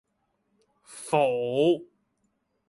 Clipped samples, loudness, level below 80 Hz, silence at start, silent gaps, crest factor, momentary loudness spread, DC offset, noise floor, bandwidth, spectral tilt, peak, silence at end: under 0.1%; -25 LUFS; -74 dBFS; 0.9 s; none; 20 dB; 6 LU; under 0.1%; -75 dBFS; 11.5 kHz; -5.5 dB/octave; -8 dBFS; 0.85 s